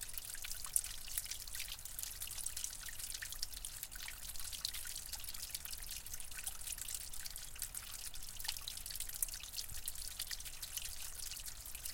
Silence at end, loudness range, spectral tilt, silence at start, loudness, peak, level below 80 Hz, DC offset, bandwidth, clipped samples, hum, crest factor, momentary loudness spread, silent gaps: 0 s; 2 LU; 0.5 dB/octave; 0 s; -43 LUFS; -12 dBFS; -54 dBFS; under 0.1%; 17 kHz; under 0.1%; none; 32 dB; 6 LU; none